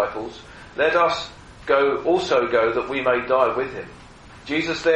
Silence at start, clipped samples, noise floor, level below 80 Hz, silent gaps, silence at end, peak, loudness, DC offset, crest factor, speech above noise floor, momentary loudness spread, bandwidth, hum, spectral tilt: 0 s; under 0.1%; -44 dBFS; -50 dBFS; none; 0 s; -4 dBFS; -21 LUFS; under 0.1%; 18 dB; 23 dB; 17 LU; 9.4 kHz; none; -4.5 dB/octave